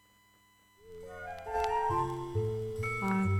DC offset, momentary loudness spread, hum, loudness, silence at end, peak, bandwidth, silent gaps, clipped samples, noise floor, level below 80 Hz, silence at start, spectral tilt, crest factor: under 0.1%; 16 LU; none; -34 LUFS; 0 s; -16 dBFS; 16 kHz; none; under 0.1%; -65 dBFS; -54 dBFS; 0.85 s; -7 dB/octave; 18 dB